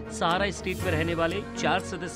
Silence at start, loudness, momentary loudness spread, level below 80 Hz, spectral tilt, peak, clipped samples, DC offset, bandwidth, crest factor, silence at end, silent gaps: 0 s; -27 LUFS; 3 LU; -48 dBFS; -4.5 dB/octave; -12 dBFS; under 0.1%; under 0.1%; 16 kHz; 16 dB; 0 s; none